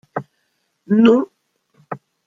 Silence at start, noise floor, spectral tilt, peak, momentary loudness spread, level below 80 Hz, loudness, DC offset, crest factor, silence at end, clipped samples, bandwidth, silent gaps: 0.15 s; -69 dBFS; -8 dB/octave; 0 dBFS; 21 LU; -64 dBFS; -15 LUFS; under 0.1%; 20 dB; 0.3 s; under 0.1%; 7.2 kHz; none